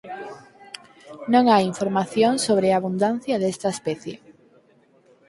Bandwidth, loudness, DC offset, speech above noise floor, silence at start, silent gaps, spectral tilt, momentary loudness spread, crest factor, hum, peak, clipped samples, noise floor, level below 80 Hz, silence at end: 11.5 kHz; -21 LUFS; under 0.1%; 37 dB; 0.05 s; none; -5 dB/octave; 22 LU; 20 dB; none; -4 dBFS; under 0.1%; -58 dBFS; -66 dBFS; 1.1 s